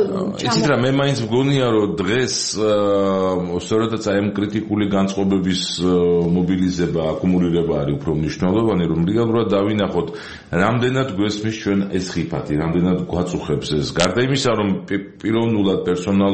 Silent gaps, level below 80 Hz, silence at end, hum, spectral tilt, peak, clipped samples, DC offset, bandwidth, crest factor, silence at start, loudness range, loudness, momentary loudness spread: none; -44 dBFS; 0 s; none; -6 dB/octave; 0 dBFS; under 0.1%; 0.2%; 8.8 kHz; 18 dB; 0 s; 2 LU; -19 LUFS; 6 LU